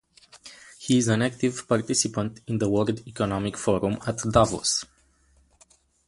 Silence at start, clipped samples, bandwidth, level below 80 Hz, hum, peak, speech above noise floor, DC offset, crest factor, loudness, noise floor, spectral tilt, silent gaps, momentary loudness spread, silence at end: 0.35 s; under 0.1%; 11.5 kHz; -50 dBFS; none; -4 dBFS; 37 dB; under 0.1%; 22 dB; -25 LUFS; -62 dBFS; -4.5 dB/octave; none; 13 LU; 1.25 s